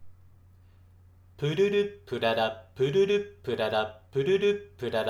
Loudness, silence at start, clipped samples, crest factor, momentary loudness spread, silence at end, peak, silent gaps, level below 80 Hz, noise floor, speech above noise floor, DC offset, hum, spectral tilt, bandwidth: -28 LUFS; 0 s; under 0.1%; 16 dB; 8 LU; 0 s; -12 dBFS; none; -62 dBFS; -56 dBFS; 28 dB; under 0.1%; none; -6 dB/octave; 13 kHz